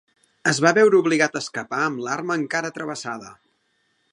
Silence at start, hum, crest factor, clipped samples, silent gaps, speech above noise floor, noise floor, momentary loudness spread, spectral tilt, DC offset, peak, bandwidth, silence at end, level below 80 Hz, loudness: 0.45 s; none; 22 dB; under 0.1%; none; 47 dB; -68 dBFS; 14 LU; -4 dB/octave; under 0.1%; -2 dBFS; 11.5 kHz; 0.8 s; -72 dBFS; -21 LUFS